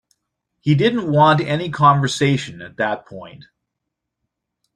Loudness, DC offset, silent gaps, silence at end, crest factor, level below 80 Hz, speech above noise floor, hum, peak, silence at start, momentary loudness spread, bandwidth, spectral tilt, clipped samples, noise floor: -17 LUFS; under 0.1%; none; 1.4 s; 18 dB; -56 dBFS; 62 dB; none; -2 dBFS; 0.65 s; 15 LU; 10.5 kHz; -6 dB/octave; under 0.1%; -80 dBFS